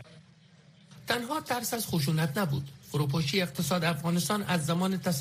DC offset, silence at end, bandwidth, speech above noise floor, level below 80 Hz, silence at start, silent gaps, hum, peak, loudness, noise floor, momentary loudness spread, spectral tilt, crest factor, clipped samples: under 0.1%; 0 s; 15.5 kHz; 28 dB; -62 dBFS; 0 s; none; none; -12 dBFS; -30 LUFS; -58 dBFS; 4 LU; -5 dB/octave; 18 dB; under 0.1%